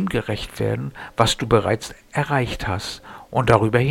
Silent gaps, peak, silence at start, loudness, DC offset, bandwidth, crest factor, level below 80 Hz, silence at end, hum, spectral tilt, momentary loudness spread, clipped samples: none; 0 dBFS; 0 s; -22 LUFS; under 0.1%; 16.5 kHz; 22 dB; -40 dBFS; 0 s; none; -5.5 dB/octave; 11 LU; under 0.1%